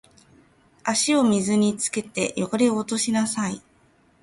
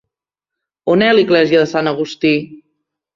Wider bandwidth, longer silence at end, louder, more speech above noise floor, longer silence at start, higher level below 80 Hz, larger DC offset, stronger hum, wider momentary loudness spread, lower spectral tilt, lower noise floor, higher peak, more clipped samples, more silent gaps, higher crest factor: first, 11.5 kHz vs 7.4 kHz; about the same, 0.65 s vs 0.6 s; second, -23 LUFS vs -14 LUFS; second, 37 dB vs 71 dB; about the same, 0.85 s vs 0.85 s; about the same, -62 dBFS vs -58 dBFS; neither; neither; about the same, 8 LU vs 9 LU; second, -4 dB/octave vs -6 dB/octave; second, -59 dBFS vs -84 dBFS; second, -8 dBFS vs 0 dBFS; neither; neither; about the same, 16 dB vs 16 dB